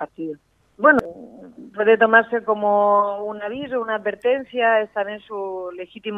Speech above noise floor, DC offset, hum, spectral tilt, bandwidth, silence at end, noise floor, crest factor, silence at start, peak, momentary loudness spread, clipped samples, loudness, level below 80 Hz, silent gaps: 21 dB; under 0.1%; none; -6.5 dB/octave; 5.8 kHz; 0 s; -41 dBFS; 20 dB; 0 s; 0 dBFS; 17 LU; under 0.1%; -19 LUFS; -60 dBFS; none